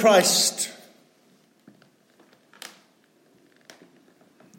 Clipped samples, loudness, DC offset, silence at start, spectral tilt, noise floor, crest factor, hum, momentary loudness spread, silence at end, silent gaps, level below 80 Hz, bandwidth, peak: under 0.1%; -20 LUFS; under 0.1%; 0 s; -1.5 dB/octave; -61 dBFS; 22 dB; none; 27 LU; 3.85 s; none; -82 dBFS; 16.5 kHz; -6 dBFS